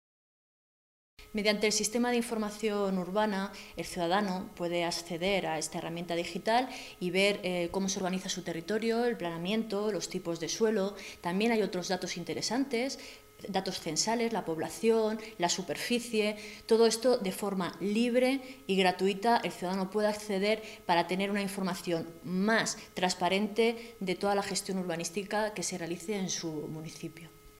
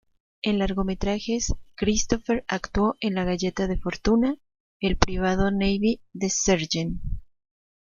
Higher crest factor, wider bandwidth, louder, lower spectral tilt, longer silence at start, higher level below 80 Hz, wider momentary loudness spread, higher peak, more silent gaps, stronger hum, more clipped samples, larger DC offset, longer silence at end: about the same, 20 dB vs 24 dB; first, 16 kHz vs 7.4 kHz; second, -31 LUFS vs -25 LUFS; about the same, -4 dB/octave vs -4.5 dB/octave; first, 1.2 s vs 0.45 s; second, -64 dBFS vs -36 dBFS; about the same, 8 LU vs 7 LU; second, -12 dBFS vs -2 dBFS; second, none vs 4.60-4.80 s; neither; neither; neither; second, 0.1 s vs 0.75 s